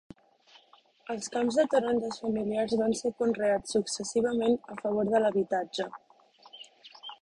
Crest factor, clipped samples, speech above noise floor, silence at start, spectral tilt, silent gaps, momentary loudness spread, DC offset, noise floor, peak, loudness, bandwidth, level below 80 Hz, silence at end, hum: 18 dB; under 0.1%; 33 dB; 1.1 s; -4.5 dB/octave; none; 19 LU; under 0.1%; -61 dBFS; -12 dBFS; -29 LUFS; 11.5 kHz; -66 dBFS; 0.1 s; none